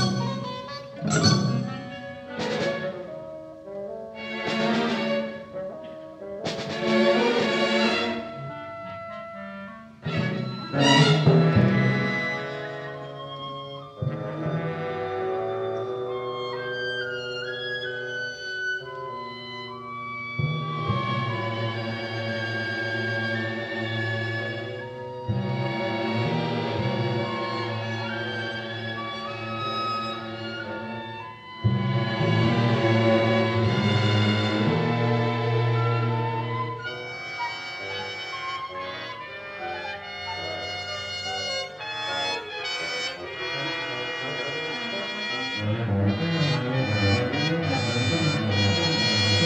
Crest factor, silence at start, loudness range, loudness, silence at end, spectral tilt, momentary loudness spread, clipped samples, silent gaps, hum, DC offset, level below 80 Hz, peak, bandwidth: 20 dB; 0 s; 9 LU; -26 LUFS; 0 s; -5.5 dB/octave; 14 LU; under 0.1%; none; none; under 0.1%; -58 dBFS; -6 dBFS; 9.4 kHz